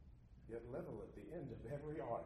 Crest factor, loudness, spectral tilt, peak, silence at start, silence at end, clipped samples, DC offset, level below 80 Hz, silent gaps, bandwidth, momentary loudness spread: 16 dB; -50 LUFS; -9 dB/octave; -32 dBFS; 0 s; 0 s; under 0.1%; under 0.1%; -64 dBFS; none; 13 kHz; 9 LU